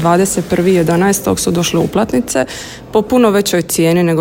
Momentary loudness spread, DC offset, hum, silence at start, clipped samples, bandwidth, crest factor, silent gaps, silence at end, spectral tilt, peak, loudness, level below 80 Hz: 6 LU; under 0.1%; none; 0 s; under 0.1%; 16.5 kHz; 12 dB; none; 0 s; -5 dB/octave; 0 dBFS; -13 LUFS; -40 dBFS